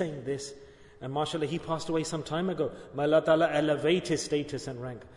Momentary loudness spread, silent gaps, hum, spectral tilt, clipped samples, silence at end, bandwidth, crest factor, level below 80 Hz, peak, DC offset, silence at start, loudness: 12 LU; none; none; -5 dB/octave; under 0.1%; 0 s; 11 kHz; 18 dB; -60 dBFS; -12 dBFS; under 0.1%; 0 s; -29 LUFS